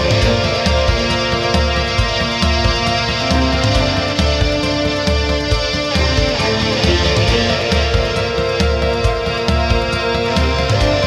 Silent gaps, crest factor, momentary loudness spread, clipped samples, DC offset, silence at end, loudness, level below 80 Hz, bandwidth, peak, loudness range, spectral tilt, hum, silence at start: none; 14 dB; 3 LU; under 0.1%; under 0.1%; 0 s; -15 LUFS; -22 dBFS; 12.5 kHz; -2 dBFS; 1 LU; -5 dB/octave; none; 0 s